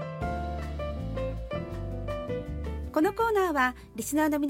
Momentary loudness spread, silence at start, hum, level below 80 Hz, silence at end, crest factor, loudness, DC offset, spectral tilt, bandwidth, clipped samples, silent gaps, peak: 11 LU; 0 s; none; -40 dBFS; 0 s; 18 dB; -30 LUFS; under 0.1%; -6 dB/octave; 16.5 kHz; under 0.1%; none; -12 dBFS